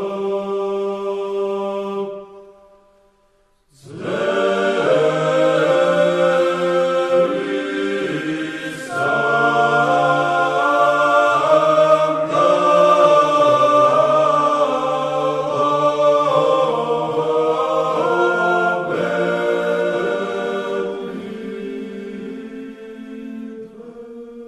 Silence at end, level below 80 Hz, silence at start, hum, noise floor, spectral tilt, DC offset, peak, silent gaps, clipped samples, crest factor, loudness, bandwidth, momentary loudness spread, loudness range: 0 s; -62 dBFS; 0 s; none; -59 dBFS; -5.5 dB/octave; under 0.1%; 0 dBFS; none; under 0.1%; 16 dB; -17 LUFS; 12 kHz; 17 LU; 12 LU